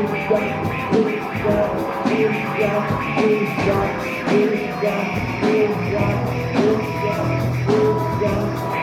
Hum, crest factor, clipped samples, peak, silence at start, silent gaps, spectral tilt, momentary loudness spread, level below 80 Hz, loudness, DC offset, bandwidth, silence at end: none; 16 dB; under 0.1%; -4 dBFS; 0 s; none; -7 dB/octave; 4 LU; -42 dBFS; -20 LUFS; under 0.1%; 16.5 kHz; 0 s